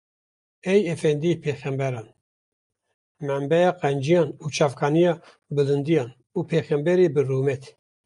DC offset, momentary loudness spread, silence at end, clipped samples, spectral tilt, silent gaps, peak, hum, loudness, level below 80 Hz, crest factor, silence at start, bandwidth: under 0.1%; 11 LU; 0.4 s; under 0.1%; -7 dB/octave; 2.21-2.70 s, 2.94-3.15 s; -6 dBFS; none; -23 LUFS; -66 dBFS; 16 dB; 0.65 s; 11 kHz